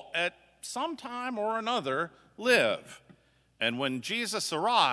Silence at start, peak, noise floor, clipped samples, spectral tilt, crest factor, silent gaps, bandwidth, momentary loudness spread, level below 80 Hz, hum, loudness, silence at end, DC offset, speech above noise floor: 0 s; -8 dBFS; -64 dBFS; under 0.1%; -3 dB/octave; 22 dB; none; 11 kHz; 12 LU; -76 dBFS; none; -30 LUFS; 0 s; under 0.1%; 34 dB